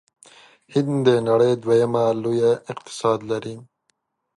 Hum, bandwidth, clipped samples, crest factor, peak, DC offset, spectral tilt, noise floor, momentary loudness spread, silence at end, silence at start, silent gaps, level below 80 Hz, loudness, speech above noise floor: none; 11.5 kHz; under 0.1%; 18 dB; -4 dBFS; under 0.1%; -6.5 dB/octave; -71 dBFS; 11 LU; 0.75 s; 0.7 s; none; -64 dBFS; -20 LUFS; 51 dB